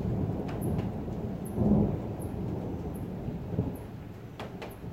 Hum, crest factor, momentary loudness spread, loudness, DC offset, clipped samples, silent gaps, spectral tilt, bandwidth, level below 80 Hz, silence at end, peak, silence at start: none; 20 dB; 14 LU; -33 LUFS; under 0.1%; under 0.1%; none; -8.5 dB/octave; 16 kHz; -44 dBFS; 0 s; -14 dBFS; 0 s